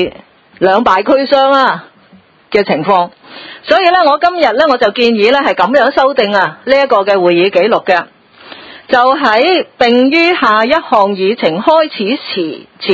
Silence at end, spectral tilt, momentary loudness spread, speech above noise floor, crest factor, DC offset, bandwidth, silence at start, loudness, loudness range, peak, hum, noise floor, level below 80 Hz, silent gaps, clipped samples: 0 s; -5.5 dB/octave; 9 LU; 34 dB; 10 dB; under 0.1%; 8 kHz; 0 s; -10 LUFS; 2 LU; 0 dBFS; none; -44 dBFS; -50 dBFS; none; 0.4%